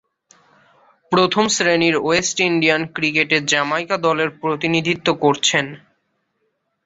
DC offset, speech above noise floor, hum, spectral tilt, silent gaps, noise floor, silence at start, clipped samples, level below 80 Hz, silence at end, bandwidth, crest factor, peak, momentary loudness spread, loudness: under 0.1%; 52 dB; none; -3.5 dB/octave; none; -70 dBFS; 1.1 s; under 0.1%; -58 dBFS; 1.1 s; 8.2 kHz; 18 dB; -2 dBFS; 5 LU; -17 LUFS